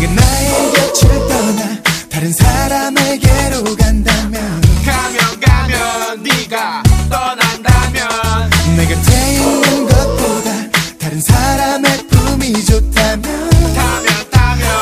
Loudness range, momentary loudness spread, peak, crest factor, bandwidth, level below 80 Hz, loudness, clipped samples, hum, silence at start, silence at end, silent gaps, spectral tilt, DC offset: 1 LU; 4 LU; 0 dBFS; 12 dB; 16 kHz; -18 dBFS; -12 LUFS; 0.3%; none; 0 s; 0 s; none; -4.5 dB/octave; under 0.1%